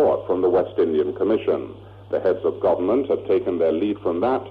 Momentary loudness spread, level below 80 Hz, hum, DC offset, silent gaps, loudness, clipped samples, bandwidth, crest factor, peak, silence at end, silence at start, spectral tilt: 4 LU; -56 dBFS; none; under 0.1%; none; -22 LUFS; under 0.1%; 4.9 kHz; 10 dB; -10 dBFS; 0 s; 0 s; -9 dB/octave